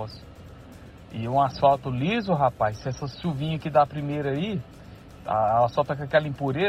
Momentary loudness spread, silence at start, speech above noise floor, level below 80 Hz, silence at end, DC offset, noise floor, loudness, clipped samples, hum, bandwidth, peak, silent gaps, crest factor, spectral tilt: 19 LU; 0 s; 21 dB; -50 dBFS; 0 s; under 0.1%; -45 dBFS; -25 LUFS; under 0.1%; none; 14 kHz; -6 dBFS; none; 18 dB; -7.5 dB/octave